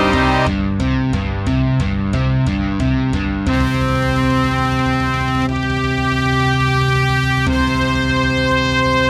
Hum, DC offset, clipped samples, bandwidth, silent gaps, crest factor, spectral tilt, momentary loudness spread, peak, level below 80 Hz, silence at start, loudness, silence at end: none; under 0.1%; under 0.1%; 12.5 kHz; none; 14 dB; -6 dB/octave; 3 LU; -2 dBFS; -26 dBFS; 0 s; -17 LUFS; 0 s